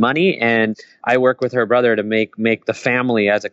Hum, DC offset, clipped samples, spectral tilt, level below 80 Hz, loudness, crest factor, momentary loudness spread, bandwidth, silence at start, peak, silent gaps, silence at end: none; under 0.1%; under 0.1%; -6 dB/octave; -68 dBFS; -17 LUFS; 14 dB; 4 LU; 8 kHz; 0 s; -2 dBFS; none; 0.05 s